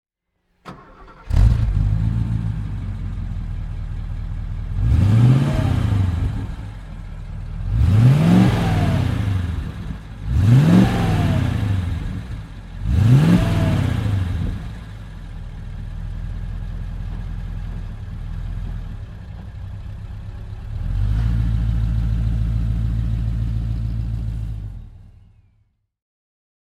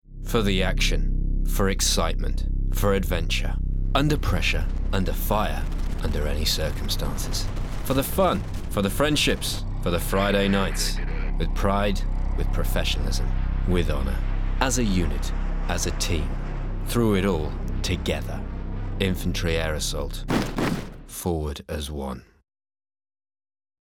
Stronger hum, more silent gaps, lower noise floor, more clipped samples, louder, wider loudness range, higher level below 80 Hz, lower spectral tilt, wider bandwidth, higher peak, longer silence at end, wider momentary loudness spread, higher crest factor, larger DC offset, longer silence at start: neither; neither; second, -70 dBFS vs under -90 dBFS; neither; first, -20 LUFS vs -26 LUFS; first, 13 LU vs 3 LU; about the same, -26 dBFS vs -26 dBFS; first, -8 dB/octave vs -4.5 dB/octave; second, 12.5 kHz vs 17 kHz; first, -2 dBFS vs -6 dBFS; about the same, 1.7 s vs 1.6 s; first, 20 LU vs 9 LU; about the same, 18 dB vs 18 dB; neither; first, 0.65 s vs 0.1 s